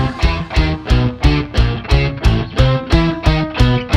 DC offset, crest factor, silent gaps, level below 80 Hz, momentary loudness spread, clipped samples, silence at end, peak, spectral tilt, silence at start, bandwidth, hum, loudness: under 0.1%; 14 dB; none; -18 dBFS; 3 LU; under 0.1%; 0 s; 0 dBFS; -6.5 dB/octave; 0 s; 9.8 kHz; none; -16 LUFS